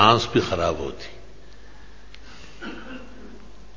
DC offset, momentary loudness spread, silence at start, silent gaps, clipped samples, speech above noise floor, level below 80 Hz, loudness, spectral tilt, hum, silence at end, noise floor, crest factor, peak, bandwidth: 1%; 26 LU; 0 s; none; under 0.1%; 26 dB; -44 dBFS; -23 LUFS; -5 dB/octave; none; 0.1 s; -47 dBFS; 24 dB; -2 dBFS; 7.6 kHz